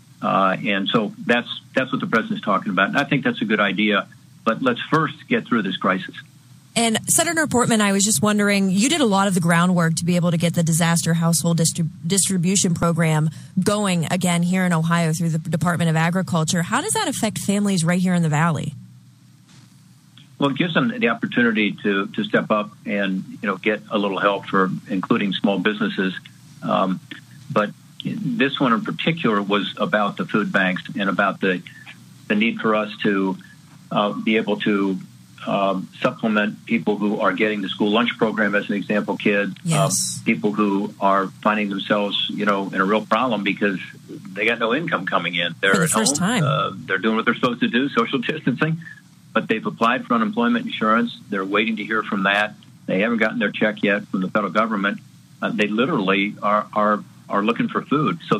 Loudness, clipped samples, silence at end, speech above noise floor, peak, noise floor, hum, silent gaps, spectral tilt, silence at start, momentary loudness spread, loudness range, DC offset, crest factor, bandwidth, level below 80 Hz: -20 LUFS; under 0.1%; 0 s; 29 dB; -2 dBFS; -49 dBFS; none; none; -4.5 dB/octave; 0.2 s; 7 LU; 4 LU; under 0.1%; 18 dB; 15.5 kHz; -62 dBFS